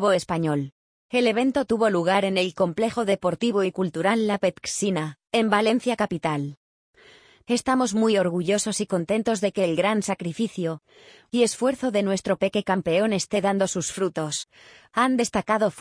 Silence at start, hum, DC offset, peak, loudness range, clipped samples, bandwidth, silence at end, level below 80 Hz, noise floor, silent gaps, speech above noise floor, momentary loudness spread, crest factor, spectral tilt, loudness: 0 s; none; under 0.1%; -6 dBFS; 2 LU; under 0.1%; 10.5 kHz; 0 s; -60 dBFS; -53 dBFS; 0.72-1.09 s, 6.57-6.94 s; 30 dB; 7 LU; 18 dB; -4.5 dB/octave; -24 LUFS